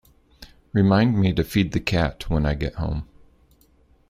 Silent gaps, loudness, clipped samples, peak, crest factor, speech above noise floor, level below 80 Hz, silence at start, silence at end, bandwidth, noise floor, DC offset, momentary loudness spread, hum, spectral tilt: none; -22 LUFS; under 0.1%; -4 dBFS; 20 dB; 37 dB; -36 dBFS; 0.4 s; 1.05 s; 15.5 kHz; -58 dBFS; under 0.1%; 10 LU; none; -7 dB/octave